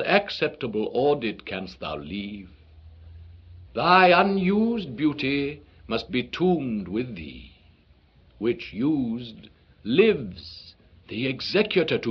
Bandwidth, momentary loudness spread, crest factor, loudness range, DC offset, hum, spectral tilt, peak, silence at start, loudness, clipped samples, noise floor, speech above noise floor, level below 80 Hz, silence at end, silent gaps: 6.6 kHz; 18 LU; 22 dB; 7 LU; under 0.1%; none; -4 dB/octave; -2 dBFS; 0 s; -24 LUFS; under 0.1%; -57 dBFS; 33 dB; -54 dBFS; 0 s; none